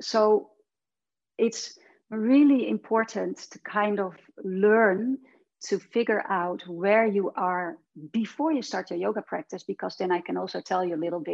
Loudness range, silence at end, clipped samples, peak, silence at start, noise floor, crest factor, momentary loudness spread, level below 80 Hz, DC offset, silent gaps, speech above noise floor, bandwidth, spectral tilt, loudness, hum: 5 LU; 0 s; under 0.1%; -8 dBFS; 0 s; under -90 dBFS; 18 dB; 14 LU; -80 dBFS; under 0.1%; none; over 64 dB; 8 kHz; -5.5 dB/octave; -26 LUFS; none